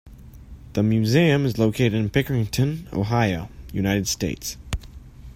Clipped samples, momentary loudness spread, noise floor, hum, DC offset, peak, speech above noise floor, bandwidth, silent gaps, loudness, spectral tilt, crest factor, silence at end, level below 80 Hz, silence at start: under 0.1%; 13 LU; -42 dBFS; none; under 0.1%; -4 dBFS; 21 dB; 16 kHz; none; -22 LUFS; -5.5 dB/octave; 18 dB; 0 s; -42 dBFS; 0.05 s